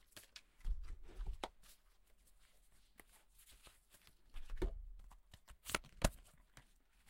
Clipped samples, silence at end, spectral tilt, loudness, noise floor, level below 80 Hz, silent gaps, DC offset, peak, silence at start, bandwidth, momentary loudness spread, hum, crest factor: under 0.1%; 0 s; -3.5 dB/octave; -48 LUFS; -69 dBFS; -50 dBFS; none; under 0.1%; -16 dBFS; 0.15 s; 16 kHz; 24 LU; none; 32 dB